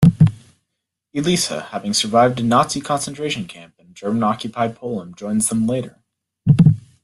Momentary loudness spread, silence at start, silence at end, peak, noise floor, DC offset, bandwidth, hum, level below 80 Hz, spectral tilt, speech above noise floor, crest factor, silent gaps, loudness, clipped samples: 14 LU; 0 s; 0.25 s; -2 dBFS; -78 dBFS; under 0.1%; 12.5 kHz; none; -46 dBFS; -5.5 dB/octave; 58 dB; 16 dB; none; -19 LUFS; under 0.1%